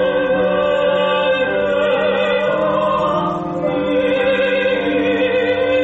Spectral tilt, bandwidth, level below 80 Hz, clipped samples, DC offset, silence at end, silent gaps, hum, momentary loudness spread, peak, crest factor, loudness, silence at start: -6.5 dB/octave; 7.8 kHz; -48 dBFS; under 0.1%; under 0.1%; 0 s; none; none; 2 LU; -6 dBFS; 10 dB; -16 LUFS; 0 s